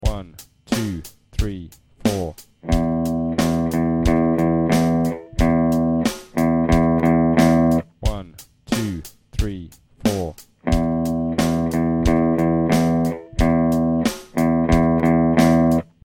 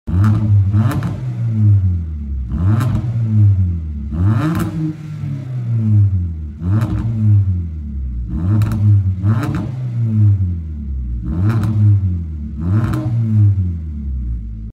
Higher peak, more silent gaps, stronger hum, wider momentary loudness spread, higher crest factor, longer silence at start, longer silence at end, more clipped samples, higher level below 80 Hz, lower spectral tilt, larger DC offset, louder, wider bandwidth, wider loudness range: about the same, -2 dBFS vs -4 dBFS; neither; neither; about the same, 12 LU vs 11 LU; first, 16 dB vs 10 dB; about the same, 0 s vs 0.05 s; first, 0.2 s vs 0 s; neither; about the same, -30 dBFS vs -28 dBFS; second, -7 dB/octave vs -9.5 dB/octave; neither; about the same, -19 LUFS vs -17 LUFS; first, 17 kHz vs 4.3 kHz; first, 6 LU vs 1 LU